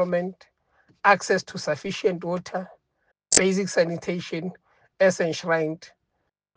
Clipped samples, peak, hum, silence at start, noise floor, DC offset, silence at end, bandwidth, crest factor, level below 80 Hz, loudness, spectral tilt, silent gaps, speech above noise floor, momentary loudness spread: under 0.1%; -2 dBFS; none; 0 s; -77 dBFS; under 0.1%; 0.7 s; 10 kHz; 24 dB; -62 dBFS; -24 LUFS; -3.5 dB/octave; none; 52 dB; 14 LU